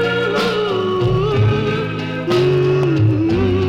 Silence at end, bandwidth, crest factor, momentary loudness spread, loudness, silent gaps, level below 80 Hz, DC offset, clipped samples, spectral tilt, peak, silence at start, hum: 0 s; 10.5 kHz; 12 dB; 5 LU; -17 LUFS; none; -38 dBFS; under 0.1%; under 0.1%; -7.5 dB/octave; -4 dBFS; 0 s; none